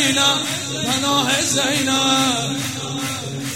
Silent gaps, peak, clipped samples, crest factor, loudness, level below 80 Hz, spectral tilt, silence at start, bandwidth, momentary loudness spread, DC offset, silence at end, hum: none; -2 dBFS; under 0.1%; 18 dB; -18 LUFS; -56 dBFS; -2.5 dB/octave; 0 s; 16.5 kHz; 9 LU; 0.2%; 0 s; none